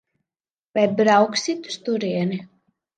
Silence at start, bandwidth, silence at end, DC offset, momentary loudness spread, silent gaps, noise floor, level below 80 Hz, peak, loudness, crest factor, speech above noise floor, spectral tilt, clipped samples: 0.75 s; 9.4 kHz; 0.5 s; under 0.1%; 12 LU; none; under -90 dBFS; -72 dBFS; -4 dBFS; -21 LUFS; 18 dB; over 70 dB; -5 dB/octave; under 0.1%